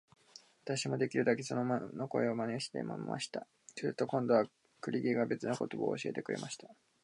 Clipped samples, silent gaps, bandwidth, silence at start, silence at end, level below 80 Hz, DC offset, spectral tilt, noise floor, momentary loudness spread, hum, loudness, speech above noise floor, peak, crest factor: under 0.1%; none; 11.5 kHz; 0.65 s; 0.3 s; -82 dBFS; under 0.1%; -5.5 dB/octave; -61 dBFS; 10 LU; none; -36 LUFS; 26 dB; -16 dBFS; 20 dB